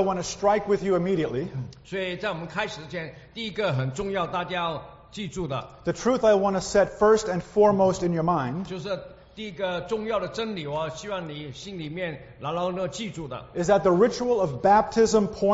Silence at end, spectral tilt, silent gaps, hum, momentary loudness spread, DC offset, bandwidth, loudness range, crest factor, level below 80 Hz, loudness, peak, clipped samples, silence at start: 0 s; -5 dB/octave; none; none; 15 LU; under 0.1%; 8 kHz; 8 LU; 18 dB; -52 dBFS; -25 LUFS; -8 dBFS; under 0.1%; 0 s